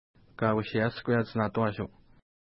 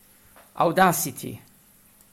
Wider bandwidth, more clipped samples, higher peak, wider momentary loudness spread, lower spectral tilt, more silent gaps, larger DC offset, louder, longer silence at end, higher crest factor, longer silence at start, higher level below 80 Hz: second, 5.8 kHz vs 16.5 kHz; neither; second, -12 dBFS vs -6 dBFS; second, 6 LU vs 19 LU; first, -11 dB/octave vs -4 dB/octave; neither; neither; second, -30 LUFS vs -22 LUFS; second, 0.6 s vs 0.75 s; about the same, 18 dB vs 20 dB; second, 0.4 s vs 0.55 s; about the same, -60 dBFS vs -64 dBFS